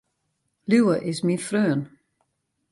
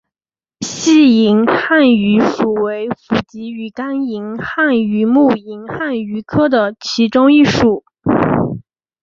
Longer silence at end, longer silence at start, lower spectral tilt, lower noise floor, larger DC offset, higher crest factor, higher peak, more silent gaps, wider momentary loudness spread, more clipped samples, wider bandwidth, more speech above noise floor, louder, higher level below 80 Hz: first, 0.85 s vs 0.4 s; about the same, 0.7 s vs 0.6 s; about the same, -6 dB/octave vs -5.5 dB/octave; second, -75 dBFS vs under -90 dBFS; neither; about the same, 18 dB vs 14 dB; second, -8 dBFS vs 0 dBFS; neither; about the same, 14 LU vs 13 LU; neither; first, 11.5 kHz vs 7.8 kHz; second, 53 dB vs over 77 dB; second, -23 LUFS vs -14 LUFS; second, -70 dBFS vs -46 dBFS